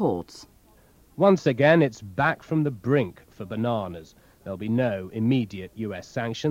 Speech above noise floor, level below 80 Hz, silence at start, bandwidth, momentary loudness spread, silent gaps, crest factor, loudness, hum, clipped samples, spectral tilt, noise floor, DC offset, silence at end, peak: 32 dB; -58 dBFS; 0 s; 16 kHz; 17 LU; none; 20 dB; -25 LUFS; none; under 0.1%; -7.5 dB/octave; -56 dBFS; under 0.1%; 0 s; -4 dBFS